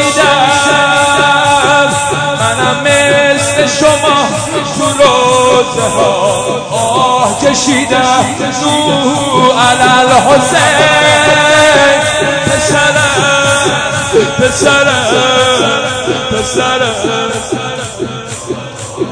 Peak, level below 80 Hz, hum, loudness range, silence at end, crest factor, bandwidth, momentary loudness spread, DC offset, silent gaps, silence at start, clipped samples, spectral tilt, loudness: 0 dBFS; -38 dBFS; none; 4 LU; 0 s; 10 dB; 11 kHz; 8 LU; under 0.1%; none; 0 s; 0.5%; -3 dB/octave; -8 LUFS